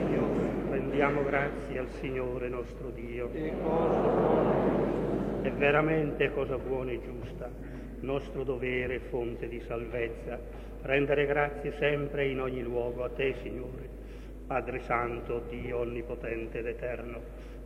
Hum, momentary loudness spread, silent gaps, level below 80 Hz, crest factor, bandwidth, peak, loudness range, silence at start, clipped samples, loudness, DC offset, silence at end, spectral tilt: none; 14 LU; none; -44 dBFS; 20 dB; 15 kHz; -12 dBFS; 7 LU; 0 s; under 0.1%; -32 LUFS; under 0.1%; 0 s; -8 dB/octave